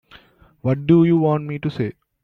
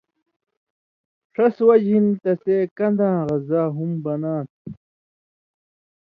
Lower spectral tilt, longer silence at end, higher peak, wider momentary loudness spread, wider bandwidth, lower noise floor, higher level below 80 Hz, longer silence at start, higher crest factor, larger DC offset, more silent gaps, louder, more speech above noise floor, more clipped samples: about the same, -10.5 dB/octave vs -11 dB/octave; second, 0.3 s vs 1.3 s; about the same, -4 dBFS vs -4 dBFS; about the same, 13 LU vs 14 LU; about the same, 4.6 kHz vs 4.9 kHz; second, -50 dBFS vs under -90 dBFS; first, -54 dBFS vs -64 dBFS; second, 0.15 s vs 1.4 s; about the same, 16 dB vs 18 dB; neither; second, none vs 2.71-2.76 s, 4.50-4.65 s; about the same, -19 LUFS vs -20 LUFS; second, 33 dB vs over 71 dB; neither